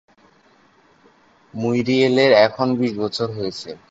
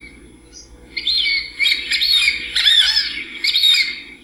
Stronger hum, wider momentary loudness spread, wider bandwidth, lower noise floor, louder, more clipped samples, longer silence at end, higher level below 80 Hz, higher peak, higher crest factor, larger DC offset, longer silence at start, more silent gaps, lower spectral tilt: second, none vs 60 Hz at -50 dBFS; first, 14 LU vs 10 LU; second, 8 kHz vs 17.5 kHz; first, -55 dBFS vs -42 dBFS; second, -18 LUFS vs -14 LUFS; neither; about the same, 0.15 s vs 0.1 s; second, -60 dBFS vs -48 dBFS; about the same, -2 dBFS vs -2 dBFS; about the same, 18 dB vs 16 dB; neither; first, 1.55 s vs 0.05 s; neither; first, -6 dB/octave vs 1.5 dB/octave